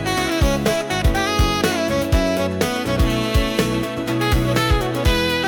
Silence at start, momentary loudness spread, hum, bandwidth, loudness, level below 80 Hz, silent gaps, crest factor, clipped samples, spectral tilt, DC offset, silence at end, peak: 0 s; 3 LU; none; 18 kHz; -19 LUFS; -24 dBFS; none; 12 dB; under 0.1%; -5 dB/octave; under 0.1%; 0 s; -6 dBFS